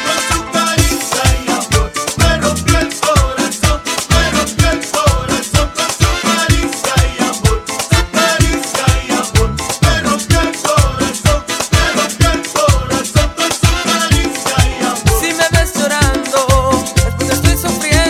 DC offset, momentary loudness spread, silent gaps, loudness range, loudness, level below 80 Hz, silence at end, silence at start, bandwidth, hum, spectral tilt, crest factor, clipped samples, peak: under 0.1%; 3 LU; none; 1 LU; -13 LUFS; -20 dBFS; 0 s; 0 s; 17 kHz; none; -4 dB/octave; 12 dB; under 0.1%; 0 dBFS